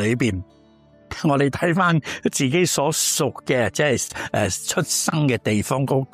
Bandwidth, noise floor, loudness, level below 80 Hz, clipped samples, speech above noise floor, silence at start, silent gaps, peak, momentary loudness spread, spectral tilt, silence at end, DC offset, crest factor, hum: 15.5 kHz; -52 dBFS; -21 LUFS; -52 dBFS; under 0.1%; 31 dB; 0 s; none; -6 dBFS; 5 LU; -4 dB/octave; 0.1 s; under 0.1%; 16 dB; none